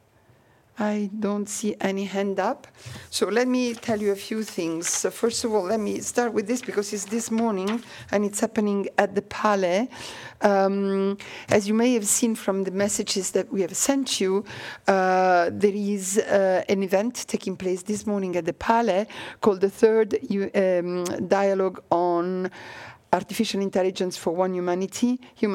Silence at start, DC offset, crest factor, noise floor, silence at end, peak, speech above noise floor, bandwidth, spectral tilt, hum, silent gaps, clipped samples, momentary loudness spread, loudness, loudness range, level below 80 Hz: 0.75 s; under 0.1%; 20 dB; -58 dBFS; 0 s; -4 dBFS; 34 dB; 17 kHz; -4 dB/octave; none; none; under 0.1%; 8 LU; -24 LUFS; 3 LU; -62 dBFS